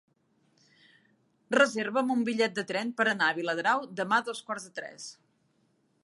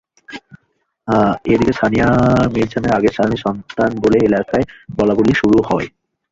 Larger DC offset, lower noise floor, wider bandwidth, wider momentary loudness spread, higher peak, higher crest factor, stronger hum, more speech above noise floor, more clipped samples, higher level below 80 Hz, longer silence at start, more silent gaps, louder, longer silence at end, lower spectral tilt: neither; first, -71 dBFS vs -66 dBFS; first, 11.5 kHz vs 7.8 kHz; about the same, 15 LU vs 13 LU; second, -10 dBFS vs -2 dBFS; first, 22 dB vs 14 dB; neither; second, 42 dB vs 52 dB; neither; second, -84 dBFS vs -38 dBFS; first, 1.5 s vs 0.3 s; neither; second, -28 LUFS vs -15 LUFS; first, 0.9 s vs 0.45 s; second, -3.5 dB/octave vs -7.5 dB/octave